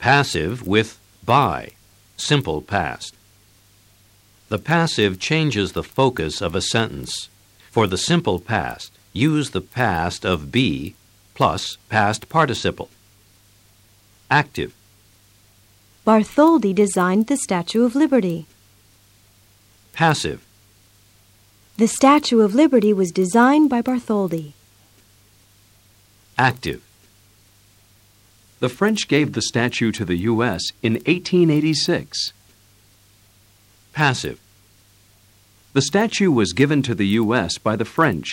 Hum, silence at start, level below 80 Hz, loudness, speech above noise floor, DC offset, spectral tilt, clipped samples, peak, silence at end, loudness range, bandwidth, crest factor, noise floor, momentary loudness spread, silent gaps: 50 Hz at -55 dBFS; 0 s; -50 dBFS; -19 LUFS; 36 dB; under 0.1%; -5 dB/octave; under 0.1%; -2 dBFS; 0 s; 9 LU; 16.5 kHz; 18 dB; -54 dBFS; 14 LU; none